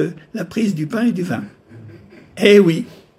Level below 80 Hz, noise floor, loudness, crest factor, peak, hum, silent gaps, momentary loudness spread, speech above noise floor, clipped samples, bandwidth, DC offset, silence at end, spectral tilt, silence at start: -62 dBFS; -41 dBFS; -17 LUFS; 18 dB; 0 dBFS; none; none; 16 LU; 25 dB; under 0.1%; 14.5 kHz; under 0.1%; 0.35 s; -6.5 dB/octave; 0 s